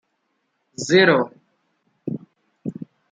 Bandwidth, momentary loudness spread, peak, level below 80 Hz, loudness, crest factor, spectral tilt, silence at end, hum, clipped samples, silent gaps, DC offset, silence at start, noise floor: 9.4 kHz; 21 LU; -4 dBFS; -70 dBFS; -19 LUFS; 20 dB; -4.5 dB/octave; 0.25 s; none; under 0.1%; none; under 0.1%; 0.8 s; -72 dBFS